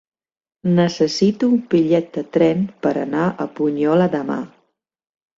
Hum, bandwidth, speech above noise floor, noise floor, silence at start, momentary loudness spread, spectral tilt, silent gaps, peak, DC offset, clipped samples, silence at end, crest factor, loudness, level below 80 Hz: none; 7.8 kHz; 49 dB; -67 dBFS; 0.65 s; 7 LU; -7 dB/octave; none; -4 dBFS; under 0.1%; under 0.1%; 0.9 s; 16 dB; -19 LUFS; -60 dBFS